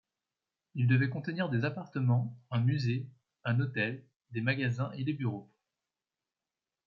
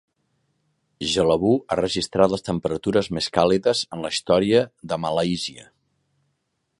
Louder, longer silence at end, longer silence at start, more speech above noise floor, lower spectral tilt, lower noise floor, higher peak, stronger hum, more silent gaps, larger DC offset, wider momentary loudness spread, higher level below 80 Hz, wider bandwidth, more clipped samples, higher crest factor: second, -33 LUFS vs -22 LUFS; first, 1.45 s vs 1.15 s; second, 0.75 s vs 1 s; first, over 59 dB vs 53 dB; first, -8.5 dB/octave vs -5 dB/octave; first, under -90 dBFS vs -74 dBFS; second, -16 dBFS vs -2 dBFS; neither; first, 4.16-4.20 s vs none; neither; first, 12 LU vs 8 LU; second, -74 dBFS vs -50 dBFS; second, 7 kHz vs 11.5 kHz; neither; about the same, 18 dB vs 22 dB